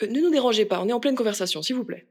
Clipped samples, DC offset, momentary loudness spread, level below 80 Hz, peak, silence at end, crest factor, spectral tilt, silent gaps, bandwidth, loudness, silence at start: under 0.1%; under 0.1%; 6 LU; -80 dBFS; -10 dBFS; 0.1 s; 14 dB; -4 dB/octave; none; 17 kHz; -23 LUFS; 0 s